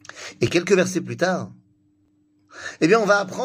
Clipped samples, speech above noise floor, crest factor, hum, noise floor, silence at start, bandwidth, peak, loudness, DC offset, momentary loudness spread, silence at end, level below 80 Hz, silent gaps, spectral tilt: under 0.1%; 42 dB; 18 dB; none; -62 dBFS; 0.15 s; 15.5 kHz; -4 dBFS; -20 LUFS; under 0.1%; 19 LU; 0 s; -60 dBFS; none; -5 dB/octave